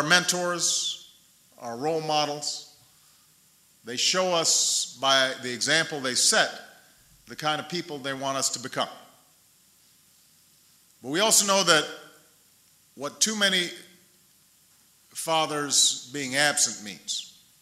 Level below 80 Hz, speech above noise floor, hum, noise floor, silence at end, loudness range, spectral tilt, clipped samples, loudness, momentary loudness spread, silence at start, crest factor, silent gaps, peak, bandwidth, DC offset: -76 dBFS; 35 dB; none; -60 dBFS; 0.3 s; 8 LU; -1 dB/octave; under 0.1%; -24 LUFS; 17 LU; 0 s; 24 dB; none; -4 dBFS; 16 kHz; under 0.1%